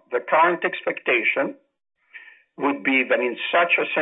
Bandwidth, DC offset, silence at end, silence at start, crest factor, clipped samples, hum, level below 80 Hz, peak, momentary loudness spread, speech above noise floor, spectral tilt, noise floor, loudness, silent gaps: 4 kHz; under 0.1%; 0 s; 0.1 s; 16 dB; under 0.1%; none; -78 dBFS; -6 dBFS; 7 LU; 25 dB; -6.5 dB/octave; -47 dBFS; -21 LUFS; none